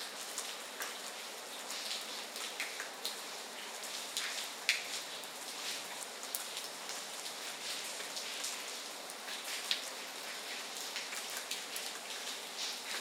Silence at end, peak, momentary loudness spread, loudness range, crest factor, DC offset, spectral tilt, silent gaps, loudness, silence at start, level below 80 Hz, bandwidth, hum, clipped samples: 0 s; -10 dBFS; 6 LU; 2 LU; 32 dB; under 0.1%; 1.5 dB/octave; none; -40 LUFS; 0 s; under -90 dBFS; 17.5 kHz; none; under 0.1%